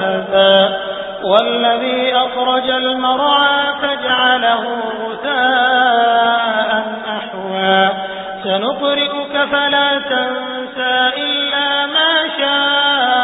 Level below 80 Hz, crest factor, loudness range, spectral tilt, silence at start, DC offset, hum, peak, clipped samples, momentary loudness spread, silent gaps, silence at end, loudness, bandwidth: -56 dBFS; 14 dB; 2 LU; -6.5 dB/octave; 0 s; under 0.1%; none; 0 dBFS; under 0.1%; 10 LU; none; 0 s; -14 LUFS; 4 kHz